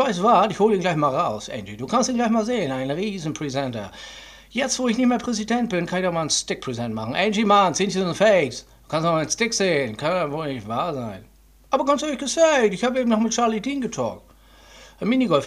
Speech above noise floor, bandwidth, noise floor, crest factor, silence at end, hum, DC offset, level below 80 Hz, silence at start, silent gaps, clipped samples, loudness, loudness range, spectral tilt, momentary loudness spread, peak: 28 dB; 13.5 kHz; -50 dBFS; 18 dB; 0 s; none; under 0.1%; -54 dBFS; 0 s; none; under 0.1%; -22 LUFS; 4 LU; -4 dB/octave; 12 LU; -4 dBFS